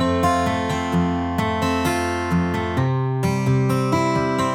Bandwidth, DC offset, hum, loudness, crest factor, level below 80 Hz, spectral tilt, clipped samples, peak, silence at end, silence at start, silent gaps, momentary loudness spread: 16.5 kHz; under 0.1%; none; -21 LUFS; 14 dB; -42 dBFS; -6.5 dB/octave; under 0.1%; -6 dBFS; 0 s; 0 s; none; 3 LU